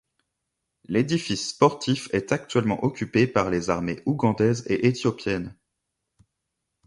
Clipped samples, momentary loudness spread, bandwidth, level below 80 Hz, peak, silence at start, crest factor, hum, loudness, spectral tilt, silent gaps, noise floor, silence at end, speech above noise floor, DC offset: under 0.1%; 6 LU; 11.5 kHz; -54 dBFS; -4 dBFS; 0.9 s; 20 dB; none; -24 LUFS; -6 dB/octave; none; -81 dBFS; 1.35 s; 57 dB; under 0.1%